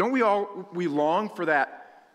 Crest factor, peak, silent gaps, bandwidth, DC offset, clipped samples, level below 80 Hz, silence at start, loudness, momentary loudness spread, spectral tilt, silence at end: 16 dB; -10 dBFS; none; 12.5 kHz; under 0.1%; under 0.1%; -78 dBFS; 0 s; -26 LUFS; 8 LU; -6.5 dB/octave; 0.3 s